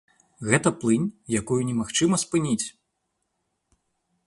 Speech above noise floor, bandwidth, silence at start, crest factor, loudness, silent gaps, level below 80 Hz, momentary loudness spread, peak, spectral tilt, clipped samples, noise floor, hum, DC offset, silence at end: 53 dB; 11.5 kHz; 0.4 s; 22 dB; -24 LUFS; none; -58 dBFS; 6 LU; -4 dBFS; -4.5 dB/octave; under 0.1%; -77 dBFS; none; under 0.1%; 1.55 s